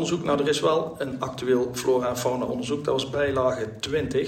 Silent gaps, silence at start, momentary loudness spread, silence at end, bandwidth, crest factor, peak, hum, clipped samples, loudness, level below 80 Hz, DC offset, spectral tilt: none; 0 s; 7 LU; 0 s; 16 kHz; 16 dB; -8 dBFS; none; under 0.1%; -25 LUFS; -52 dBFS; under 0.1%; -5 dB/octave